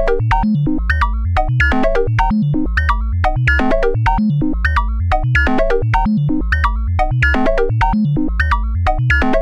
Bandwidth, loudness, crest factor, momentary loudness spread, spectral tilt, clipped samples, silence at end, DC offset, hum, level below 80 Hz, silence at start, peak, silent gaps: 8.8 kHz; -16 LUFS; 12 dB; 3 LU; -8 dB/octave; under 0.1%; 0 s; under 0.1%; none; -18 dBFS; 0 s; -2 dBFS; none